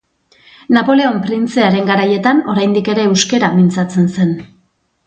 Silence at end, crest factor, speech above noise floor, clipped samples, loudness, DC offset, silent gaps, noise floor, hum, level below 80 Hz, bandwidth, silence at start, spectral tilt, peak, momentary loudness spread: 0.6 s; 14 dB; 46 dB; under 0.1%; -13 LUFS; under 0.1%; none; -58 dBFS; none; -56 dBFS; 9 kHz; 0.7 s; -5.5 dB/octave; 0 dBFS; 5 LU